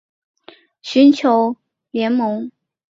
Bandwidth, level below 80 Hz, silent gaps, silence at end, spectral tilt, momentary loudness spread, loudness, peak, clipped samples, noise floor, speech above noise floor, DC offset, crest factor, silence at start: 7.6 kHz; -66 dBFS; none; 0.45 s; -5.5 dB/octave; 21 LU; -16 LUFS; -2 dBFS; under 0.1%; -47 dBFS; 32 dB; under 0.1%; 16 dB; 0.85 s